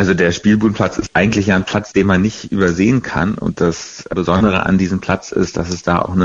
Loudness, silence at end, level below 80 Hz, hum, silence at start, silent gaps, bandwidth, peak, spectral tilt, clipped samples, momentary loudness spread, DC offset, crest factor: -16 LUFS; 0 s; -38 dBFS; none; 0 s; none; 7.8 kHz; -4 dBFS; -6 dB/octave; under 0.1%; 5 LU; under 0.1%; 12 dB